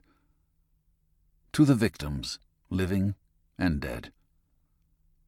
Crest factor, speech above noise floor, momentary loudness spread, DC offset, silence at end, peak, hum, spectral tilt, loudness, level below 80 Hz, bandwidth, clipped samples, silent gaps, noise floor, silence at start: 22 dB; 43 dB; 16 LU; under 0.1%; 1.2 s; -10 dBFS; none; -6.5 dB/octave; -29 LUFS; -48 dBFS; 16 kHz; under 0.1%; none; -70 dBFS; 1.55 s